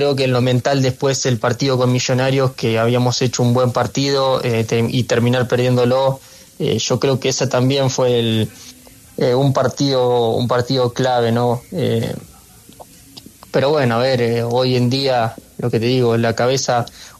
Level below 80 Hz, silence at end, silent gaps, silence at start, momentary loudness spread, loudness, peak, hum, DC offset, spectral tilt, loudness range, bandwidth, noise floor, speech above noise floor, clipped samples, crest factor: -52 dBFS; 0.1 s; none; 0 s; 5 LU; -17 LUFS; -4 dBFS; none; under 0.1%; -5.5 dB/octave; 3 LU; 13.5 kHz; -43 dBFS; 27 dB; under 0.1%; 14 dB